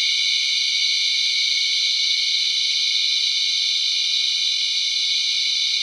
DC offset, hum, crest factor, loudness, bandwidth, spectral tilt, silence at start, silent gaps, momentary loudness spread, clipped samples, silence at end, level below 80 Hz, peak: under 0.1%; none; 14 dB; -17 LUFS; 15.5 kHz; 10 dB/octave; 0 s; none; 1 LU; under 0.1%; 0 s; under -90 dBFS; -8 dBFS